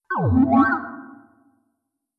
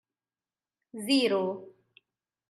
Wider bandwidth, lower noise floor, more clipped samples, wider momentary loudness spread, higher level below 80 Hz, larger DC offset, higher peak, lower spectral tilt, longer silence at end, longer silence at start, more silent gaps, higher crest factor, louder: second, 4.9 kHz vs 14.5 kHz; second, -76 dBFS vs under -90 dBFS; neither; about the same, 20 LU vs 18 LU; first, -52 dBFS vs -86 dBFS; neither; first, -4 dBFS vs -14 dBFS; first, -10.5 dB/octave vs -4 dB/octave; first, 1.05 s vs 0.8 s; second, 0.1 s vs 0.95 s; neither; about the same, 18 dB vs 20 dB; first, -19 LUFS vs -28 LUFS